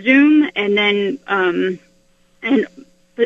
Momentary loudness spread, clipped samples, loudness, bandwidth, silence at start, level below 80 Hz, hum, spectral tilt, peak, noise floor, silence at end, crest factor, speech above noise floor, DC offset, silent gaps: 16 LU; under 0.1%; -16 LUFS; 7 kHz; 0 s; -62 dBFS; none; -6.5 dB/octave; -2 dBFS; -55 dBFS; 0 s; 16 dB; 40 dB; under 0.1%; none